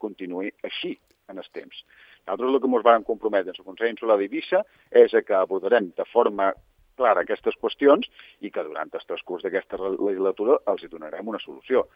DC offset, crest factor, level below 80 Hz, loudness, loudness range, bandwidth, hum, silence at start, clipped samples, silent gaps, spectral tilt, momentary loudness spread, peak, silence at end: under 0.1%; 20 dB; -66 dBFS; -24 LUFS; 5 LU; 5 kHz; none; 0 s; under 0.1%; none; -7 dB/octave; 19 LU; -2 dBFS; 0.1 s